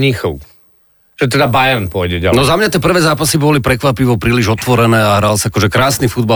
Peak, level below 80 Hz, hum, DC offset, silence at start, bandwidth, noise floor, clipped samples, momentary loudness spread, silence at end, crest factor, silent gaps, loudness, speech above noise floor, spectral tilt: -2 dBFS; -34 dBFS; none; under 0.1%; 0 s; 19 kHz; -52 dBFS; under 0.1%; 5 LU; 0 s; 10 dB; none; -12 LUFS; 40 dB; -5 dB/octave